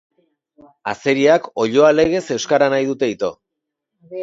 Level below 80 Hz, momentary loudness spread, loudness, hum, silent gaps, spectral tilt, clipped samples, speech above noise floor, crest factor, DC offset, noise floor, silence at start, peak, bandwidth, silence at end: -54 dBFS; 13 LU; -17 LUFS; none; none; -4.5 dB/octave; under 0.1%; 64 dB; 18 dB; under 0.1%; -80 dBFS; 0.85 s; 0 dBFS; 7.8 kHz; 0 s